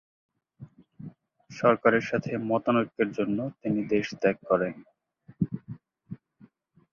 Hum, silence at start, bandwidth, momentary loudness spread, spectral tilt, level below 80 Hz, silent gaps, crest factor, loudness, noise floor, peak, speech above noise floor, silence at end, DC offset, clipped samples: none; 0.6 s; 7.2 kHz; 23 LU; -7 dB/octave; -64 dBFS; none; 24 dB; -27 LUFS; -59 dBFS; -6 dBFS; 33 dB; 0.8 s; under 0.1%; under 0.1%